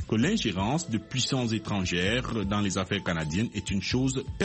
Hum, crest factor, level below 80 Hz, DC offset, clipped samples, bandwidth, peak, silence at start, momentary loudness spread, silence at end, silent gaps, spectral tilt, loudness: none; 16 dB; -46 dBFS; under 0.1%; under 0.1%; 8.8 kHz; -12 dBFS; 0 s; 4 LU; 0 s; none; -4.5 dB/octave; -28 LUFS